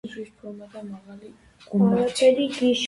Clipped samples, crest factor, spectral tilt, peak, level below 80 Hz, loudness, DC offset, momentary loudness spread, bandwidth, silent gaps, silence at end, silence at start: under 0.1%; 18 dB; -5.5 dB/octave; -6 dBFS; -62 dBFS; -21 LUFS; under 0.1%; 20 LU; 11.5 kHz; none; 0 s; 0.05 s